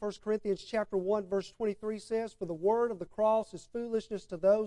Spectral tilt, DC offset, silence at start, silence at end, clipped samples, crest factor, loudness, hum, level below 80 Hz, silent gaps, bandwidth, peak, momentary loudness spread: -6 dB/octave; under 0.1%; 0 s; 0 s; under 0.1%; 16 dB; -33 LUFS; none; -64 dBFS; none; 11 kHz; -16 dBFS; 9 LU